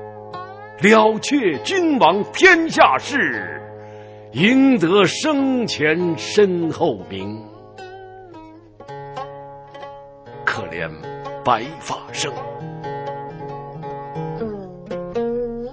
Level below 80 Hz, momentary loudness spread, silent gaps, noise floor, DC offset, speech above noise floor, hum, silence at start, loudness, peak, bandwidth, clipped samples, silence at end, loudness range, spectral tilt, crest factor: -52 dBFS; 23 LU; none; -41 dBFS; under 0.1%; 24 dB; none; 0 s; -18 LUFS; 0 dBFS; 8 kHz; under 0.1%; 0 s; 14 LU; -4.5 dB/octave; 20 dB